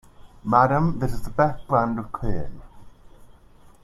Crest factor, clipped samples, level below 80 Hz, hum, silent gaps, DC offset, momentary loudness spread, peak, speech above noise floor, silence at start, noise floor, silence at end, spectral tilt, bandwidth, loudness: 20 dB; under 0.1%; -38 dBFS; none; none; under 0.1%; 14 LU; -2 dBFS; 28 dB; 0.2 s; -50 dBFS; 0.6 s; -8.5 dB/octave; 13 kHz; -23 LUFS